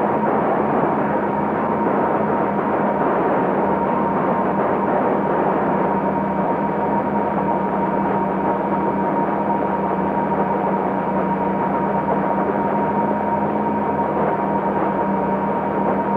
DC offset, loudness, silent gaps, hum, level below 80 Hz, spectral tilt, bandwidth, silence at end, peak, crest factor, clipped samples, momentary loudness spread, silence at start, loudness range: under 0.1%; -20 LUFS; none; none; -48 dBFS; -10 dB/octave; 4.8 kHz; 0 s; -6 dBFS; 14 dB; under 0.1%; 2 LU; 0 s; 1 LU